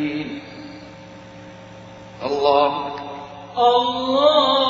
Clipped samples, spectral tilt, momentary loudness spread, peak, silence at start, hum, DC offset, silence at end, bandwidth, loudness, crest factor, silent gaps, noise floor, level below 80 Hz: under 0.1%; -5 dB/octave; 24 LU; -2 dBFS; 0 s; none; under 0.1%; 0 s; 7.4 kHz; -19 LUFS; 18 dB; none; -40 dBFS; -58 dBFS